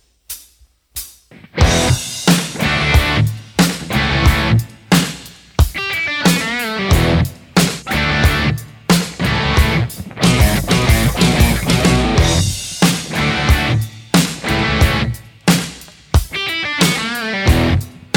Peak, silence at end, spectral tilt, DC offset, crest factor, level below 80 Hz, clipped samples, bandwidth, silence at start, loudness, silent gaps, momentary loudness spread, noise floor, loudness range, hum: 0 dBFS; 0.2 s; -4.5 dB/octave; under 0.1%; 16 dB; -22 dBFS; under 0.1%; 19 kHz; 0.3 s; -15 LUFS; none; 9 LU; -52 dBFS; 2 LU; none